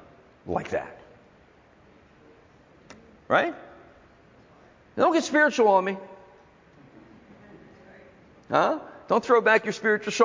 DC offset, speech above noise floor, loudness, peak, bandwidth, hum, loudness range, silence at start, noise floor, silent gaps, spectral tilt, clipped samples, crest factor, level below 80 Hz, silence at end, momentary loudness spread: under 0.1%; 34 dB; -24 LUFS; -6 dBFS; 7.6 kHz; none; 8 LU; 0.45 s; -56 dBFS; none; -4.5 dB/octave; under 0.1%; 20 dB; -62 dBFS; 0 s; 19 LU